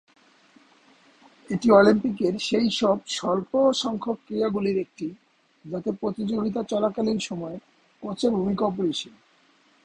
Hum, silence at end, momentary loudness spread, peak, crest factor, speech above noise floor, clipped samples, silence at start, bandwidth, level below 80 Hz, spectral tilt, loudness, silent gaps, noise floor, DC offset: none; 0.75 s; 15 LU; -4 dBFS; 22 dB; 37 dB; under 0.1%; 1.5 s; 10.5 kHz; -60 dBFS; -5.5 dB/octave; -24 LUFS; none; -61 dBFS; under 0.1%